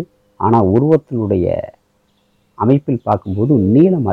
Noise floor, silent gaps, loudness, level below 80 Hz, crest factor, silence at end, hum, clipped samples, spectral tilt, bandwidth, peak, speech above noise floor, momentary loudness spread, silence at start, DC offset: -60 dBFS; none; -15 LUFS; -46 dBFS; 14 dB; 0 s; none; under 0.1%; -11.5 dB/octave; 4.9 kHz; 0 dBFS; 46 dB; 9 LU; 0 s; under 0.1%